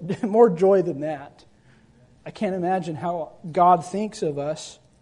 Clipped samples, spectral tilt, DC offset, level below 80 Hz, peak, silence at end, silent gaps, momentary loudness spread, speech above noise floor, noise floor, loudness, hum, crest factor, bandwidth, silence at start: under 0.1%; -7 dB/octave; under 0.1%; -64 dBFS; -4 dBFS; 0.3 s; none; 16 LU; 33 dB; -55 dBFS; -22 LUFS; none; 20 dB; 11 kHz; 0 s